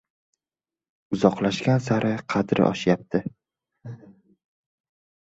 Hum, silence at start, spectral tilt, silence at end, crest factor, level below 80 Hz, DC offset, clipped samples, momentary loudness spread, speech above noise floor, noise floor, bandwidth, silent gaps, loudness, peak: none; 1.1 s; -7 dB/octave; 1.15 s; 24 dB; -58 dBFS; under 0.1%; under 0.1%; 21 LU; over 68 dB; under -90 dBFS; 8 kHz; none; -23 LUFS; -2 dBFS